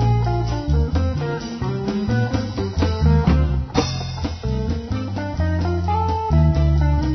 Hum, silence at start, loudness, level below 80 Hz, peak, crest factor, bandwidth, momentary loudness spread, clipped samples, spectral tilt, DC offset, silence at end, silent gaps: none; 0 s; -21 LUFS; -24 dBFS; -2 dBFS; 16 dB; 6.4 kHz; 8 LU; under 0.1%; -7.5 dB/octave; under 0.1%; 0 s; none